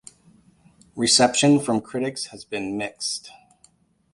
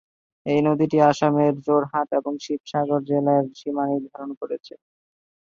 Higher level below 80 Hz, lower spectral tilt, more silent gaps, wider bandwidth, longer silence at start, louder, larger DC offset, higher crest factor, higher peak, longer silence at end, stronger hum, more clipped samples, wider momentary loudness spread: about the same, -62 dBFS vs -66 dBFS; second, -3 dB/octave vs -7.5 dB/octave; second, none vs 2.60-2.64 s, 4.37-4.41 s; first, 11.5 kHz vs 7.6 kHz; first, 0.95 s vs 0.45 s; about the same, -22 LUFS vs -22 LUFS; neither; about the same, 20 dB vs 20 dB; about the same, -4 dBFS vs -4 dBFS; about the same, 0.85 s vs 0.9 s; neither; neither; about the same, 15 LU vs 14 LU